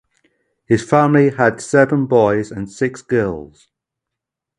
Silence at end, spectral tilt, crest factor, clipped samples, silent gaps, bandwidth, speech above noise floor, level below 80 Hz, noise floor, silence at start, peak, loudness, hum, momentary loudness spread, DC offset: 1.15 s; -7 dB/octave; 18 dB; under 0.1%; none; 11 kHz; 67 dB; -50 dBFS; -83 dBFS; 0.7 s; 0 dBFS; -16 LUFS; none; 10 LU; under 0.1%